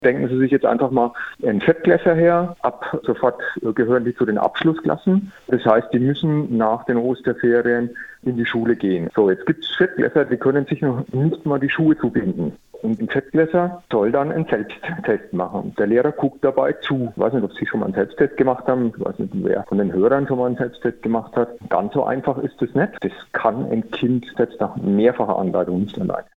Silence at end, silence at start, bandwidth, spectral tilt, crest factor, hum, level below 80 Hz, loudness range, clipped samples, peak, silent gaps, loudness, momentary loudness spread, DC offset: 0.15 s; 0 s; 6.4 kHz; -9 dB/octave; 20 dB; none; -56 dBFS; 2 LU; under 0.1%; 0 dBFS; none; -20 LUFS; 7 LU; under 0.1%